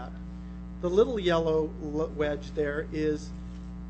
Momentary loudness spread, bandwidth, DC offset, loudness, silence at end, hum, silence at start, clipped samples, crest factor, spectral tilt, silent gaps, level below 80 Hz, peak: 16 LU; 8.4 kHz; under 0.1%; -29 LUFS; 0 s; 60 Hz at -40 dBFS; 0 s; under 0.1%; 18 dB; -6.5 dB/octave; none; -42 dBFS; -12 dBFS